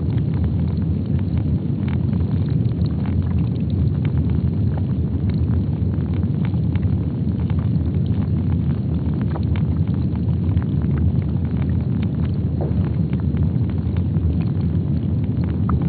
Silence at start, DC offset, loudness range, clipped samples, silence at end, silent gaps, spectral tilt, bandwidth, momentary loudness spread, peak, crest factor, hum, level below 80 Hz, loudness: 0 s; under 0.1%; 0 LU; under 0.1%; 0 s; none; -10.5 dB/octave; 4.6 kHz; 2 LU; -6 dBFS; 12 dB; none; -30 dBFS; -21 LUFS